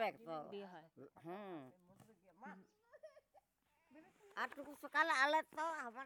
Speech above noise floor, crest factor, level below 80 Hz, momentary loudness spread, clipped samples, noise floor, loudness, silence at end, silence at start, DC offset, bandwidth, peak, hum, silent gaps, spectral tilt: 38 dB; 24 dB; under -90 dBFS; 27 LU; under 0.1%; -81 dBFS; -41 LUFS; 0 s; 0 s; under 0.1%; 19.5 kHz; -22 dBFS; none; none; -3 dB/octave